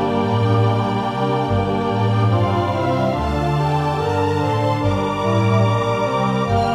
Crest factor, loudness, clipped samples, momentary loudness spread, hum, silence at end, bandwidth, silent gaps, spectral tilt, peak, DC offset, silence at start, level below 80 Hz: 12 dB; -19 LUFS; under 0.1%; 3 LU; none; 0 s; 10 kHz; none; -7.5 dB/octave; -4 dBFS; under 0.1%; 0 s; -38 dBFS